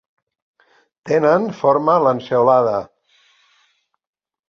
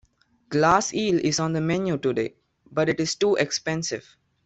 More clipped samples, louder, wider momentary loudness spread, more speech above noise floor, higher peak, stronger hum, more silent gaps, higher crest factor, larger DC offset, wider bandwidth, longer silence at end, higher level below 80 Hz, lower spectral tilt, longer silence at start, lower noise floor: neither; first, -16 LUFS vs -24 LUFS; second, 6 LU vs 10 LU; first, 48 dB vs 31 dB; about the same, -2 dBFS vs -4 dBFS; neither; neither; about the same, 18 dB vs 20 dB; neither; second, 7 kHz vs 8.4 kHz; first, 1.65 s vs 0.45 s; second, -64 dBFS vs -58 dBFS; first, -7.5 dB/octave vs -4.5 dB/octave; first, 1.05 s vs 0.5 s; first, -64 dBFS vs -54 dBFS